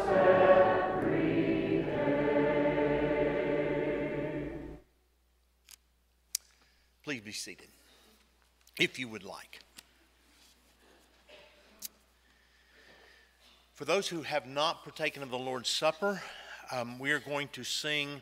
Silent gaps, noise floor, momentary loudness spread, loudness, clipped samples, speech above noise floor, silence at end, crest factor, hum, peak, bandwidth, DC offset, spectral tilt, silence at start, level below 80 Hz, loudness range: none; -70 dBFS; 18 LU; -31 LUFS; under 0.1%; 35 dB; 0 s; 26 dB; none; -6 dBFS; 16 kHz; under 0.1%; -4.5 dB/octave; 0 s; -58 dBFS; 22 LU